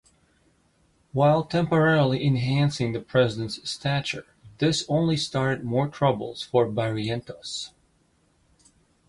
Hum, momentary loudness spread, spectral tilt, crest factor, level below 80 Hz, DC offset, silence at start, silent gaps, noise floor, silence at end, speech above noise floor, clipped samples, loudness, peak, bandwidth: none; 12 LU; -6 dB/octave; 18 dB; -56 dBFS; under 0.1%; 1.15 s; none; -65 dBFS; 1.4 s; 41 dB; under 0.1%; -25 LUFS; -8 dBFS; 11.5 kHz